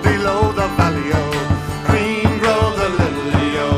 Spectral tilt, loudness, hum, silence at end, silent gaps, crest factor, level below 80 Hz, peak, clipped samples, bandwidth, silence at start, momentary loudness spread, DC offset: -6 dB/octave; -17 LUFS; none; 0 s; none; 16 dB; -32 dBFS; -2 dBFS; under 0.1%; 15 kHz; 0 s; 3 LU; under 0.1%